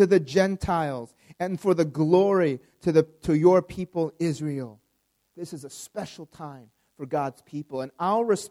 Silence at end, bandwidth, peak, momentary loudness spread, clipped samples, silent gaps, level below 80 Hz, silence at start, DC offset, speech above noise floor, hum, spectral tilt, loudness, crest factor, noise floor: 0 s; 14 kHz; -6 dBFS; 20 LU; under 0.1%; none; -54 dBFS; 0 s; under 0.1%; 48 dB; none; -7 dB/octave; -25 LUFS; 20 dB; -73 dBFS